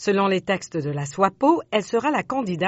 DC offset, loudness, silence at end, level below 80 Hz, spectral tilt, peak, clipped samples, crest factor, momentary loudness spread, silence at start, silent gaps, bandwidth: under 0.1%; -22 LUFS; 0 s; -60 dBFS; -4.5 dB/octave; -4 dBFS; under 0.1%; 18 dB; 7 LU; 0 s; none; 8 kHz